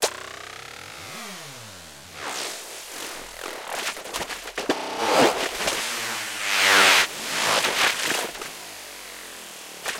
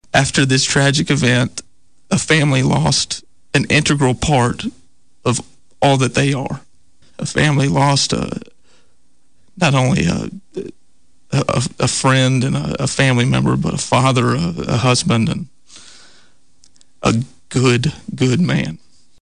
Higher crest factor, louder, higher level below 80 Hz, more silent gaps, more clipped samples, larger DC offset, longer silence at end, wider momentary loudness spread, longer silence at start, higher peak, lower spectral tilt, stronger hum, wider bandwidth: first, 22 dB vs 14 dB; second, -22 LUFS vs -16 LUFS; second, -60 dBFS vs -40 dBFS; neither; neither; second, under 0.1% vs 0.7%; second, 0 s vs 0.45 s; first, 19 LU vs 13 LU; second, 0 s vs 0.15 s; about the same, -4 dBFS vs -4 dBFS; second, -0.5 dB/octave vs -4.5 dB/octave; neither; first, 17 kHz vs 10.5 kHz